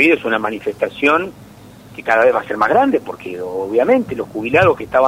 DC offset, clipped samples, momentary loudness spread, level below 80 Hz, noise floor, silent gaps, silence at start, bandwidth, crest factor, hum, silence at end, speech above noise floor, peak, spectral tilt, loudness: under 0.1%; under 0.1%; 13 LU; -50 dBFS; -40 dBFS; none; 0 s; 15.5 kHz; 16 dB; none; 0 s; 24 dB; 0 dBFS; -6 dB/octave; -16 LUFS